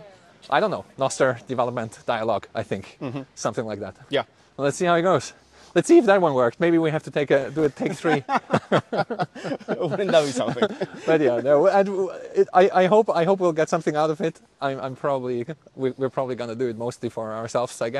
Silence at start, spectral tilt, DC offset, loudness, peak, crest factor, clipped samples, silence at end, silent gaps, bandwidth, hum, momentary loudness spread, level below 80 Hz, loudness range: 0 s; -5.5 dB/octave; under 0.1%; -23 LUFS; -4 dBFS; 20 dB; under 0.1%; 0 s; none; 12 kHz; none; 12 LU; -64 dBFS; 7 LU